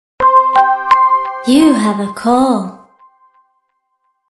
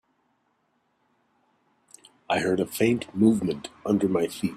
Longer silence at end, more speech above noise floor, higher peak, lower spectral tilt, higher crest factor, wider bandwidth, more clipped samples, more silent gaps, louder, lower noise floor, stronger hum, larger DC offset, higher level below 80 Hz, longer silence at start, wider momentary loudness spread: first, 1.55 s vs 0 s; first, 53 dB vs 47 dB; first, 0 dBFS vs -8 dBFS; about the same, -5 dB/octave vs -6 dB/octave; second, 14 dB vs 20 dB; second, 12.5 kHz vs 15.5 kHz; neither; neither; first, -11 LUFS vs -25 LUFS; second, -65 dBFS vs -71 dBFS; neither; neither; first, -52 dBFS vs -62 dBFS; second, 0.2 s vs 2.3 s; about the same, 8 LU vs 7 LU